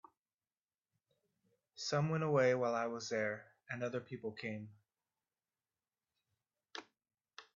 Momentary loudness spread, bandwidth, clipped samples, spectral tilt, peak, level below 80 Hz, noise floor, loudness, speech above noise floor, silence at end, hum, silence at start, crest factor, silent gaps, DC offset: 20 LU; 7.4 kHz; under 0.1%; -5 dB/octave; -20 dBFS; -82 dBFS; under -90 dBFS; -38 LUFS; over 53 dB; 0.15 s; none; 1.75 s; 22 dB; none; under 0.1%